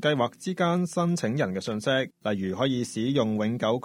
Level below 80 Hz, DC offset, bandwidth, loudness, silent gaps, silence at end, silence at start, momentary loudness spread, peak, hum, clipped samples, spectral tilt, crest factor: -66 dBFS; under 0.1%; 13.5 kHz; -27 LUFS; none; 0.05 s; 0 s; 4 LU; -10 dBFS; none; under 0.1%; -5.5 dB/octave; 16 dB